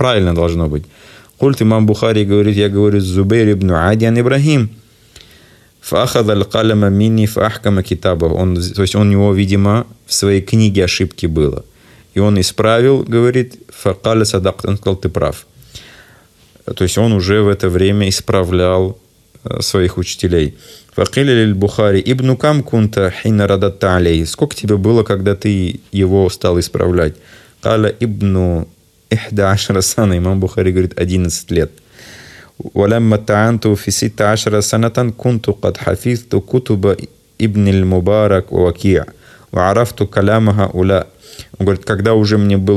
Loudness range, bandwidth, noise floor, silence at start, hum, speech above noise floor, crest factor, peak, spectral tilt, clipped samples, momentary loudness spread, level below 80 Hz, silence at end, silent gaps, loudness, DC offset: 3 LU; 14 kHz; -47 dBFS; 0 s; none; 34 dB; 14 dB; 0 dBFS; -6 dB/octave; under 0.1%; 7 LU; -38 dBFS; 0 s; none; -14 LUFS; under 0.1%